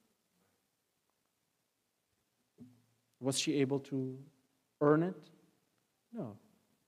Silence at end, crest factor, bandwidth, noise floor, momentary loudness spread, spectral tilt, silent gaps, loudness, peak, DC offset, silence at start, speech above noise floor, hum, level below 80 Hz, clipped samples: 0.5 s; 24 dB; 15.5 kHz; -82 dBFS; 19 LU; -5 dB/octave; none; -35 LUFS; -16 dBFS; under 0.1%; 2.6 s; 49 dB; none; under -90 dBFS; under 0.1%